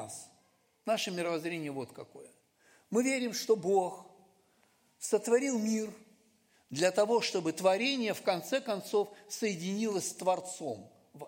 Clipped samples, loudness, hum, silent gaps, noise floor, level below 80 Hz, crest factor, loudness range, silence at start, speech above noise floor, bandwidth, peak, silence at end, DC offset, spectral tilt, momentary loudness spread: under 0.1%; -32 LUFS; none; none; -70 dBFS; -86 dBFS; 20 dB; 3 LU; 0 s; 38 dB; 16.5 kHz; -14 dBFS; 0 s; under 0.1%; -3.5 dB/octave; 14 LU